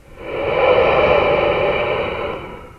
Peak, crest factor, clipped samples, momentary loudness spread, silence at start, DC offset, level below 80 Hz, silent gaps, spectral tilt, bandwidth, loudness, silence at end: 0 dBFS; 16 dB; under 0.1%; 12 LU; 0.1 s; under 0.1%; -38 dBFS; none; -6.5 dB/octave; 6.6 kHz; -16 LUFS; 0.05 s